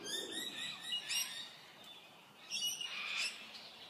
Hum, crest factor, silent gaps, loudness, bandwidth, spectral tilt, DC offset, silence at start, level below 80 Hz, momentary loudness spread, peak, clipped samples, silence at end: none; 18 dB; none; -40 LUFS; 15.5 kHz; 1 dB/octave; under 0.1%; 0 s; -86 dBFS; 17 LU; -26 dBFS; under 0.1%; 0 s